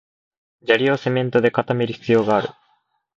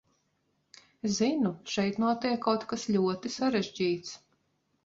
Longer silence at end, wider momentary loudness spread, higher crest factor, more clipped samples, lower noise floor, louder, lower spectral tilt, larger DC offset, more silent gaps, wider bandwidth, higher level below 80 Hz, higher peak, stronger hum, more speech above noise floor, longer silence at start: about the same, 0.65 s vs 0.7 s; about the same, 5 LU vs 7 LU; about the same, 20 dB vs 18 dB; neither; second, -65 dBFS vs -75 dBFS; first, -19 LUFS vs -30 LUFS; first, -7 dB/octave vs -5 dB/octave; neither; neither; about the same, 7.6 kHz vs 7.8 kHz; first, -62 dBFS vs -68 dBFS; first, -2 dBFS vs -12 dBFS; neither; about the same, 47 dB vs 46 dB; second, 0.65 s vs 1.05 s